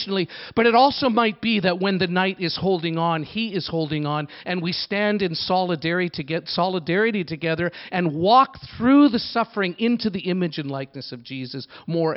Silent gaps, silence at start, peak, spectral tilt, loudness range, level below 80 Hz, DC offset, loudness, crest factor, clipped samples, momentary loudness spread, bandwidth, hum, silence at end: none; 0 s; -4 dBFS; -10.5 dB/octave; 4 LU; -58 dBFS; under 0.1%; -22 LUFS; 18 dB; under 0.1%; 11 LU; 5.8 kHz; none; 0 s